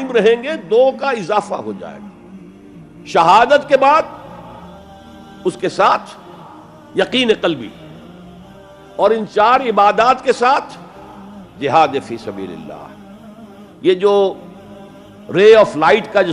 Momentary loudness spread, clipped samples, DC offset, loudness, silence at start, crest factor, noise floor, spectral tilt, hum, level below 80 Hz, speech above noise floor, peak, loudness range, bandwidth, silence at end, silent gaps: 23 LU; under 0.1%; under 0.1%; -14 LUFS; 0 s; 16 dB; -39 dBFS; -5 dB/octave; none; -54 dBFS; 26 dB; 0 dBFS; 6 LU; 11 kHz; 0 s; none